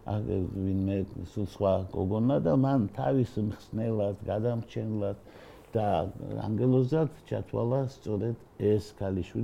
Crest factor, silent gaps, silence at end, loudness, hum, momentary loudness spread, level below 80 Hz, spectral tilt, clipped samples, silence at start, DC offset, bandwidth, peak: 16 dB; none; 0 s; -30 LUFS; none; 10 LU; -54 dBFS; -9.5 dB/octave; under 0.1%; 0 s; under 0.1%; 11 kHz; -14 dBFS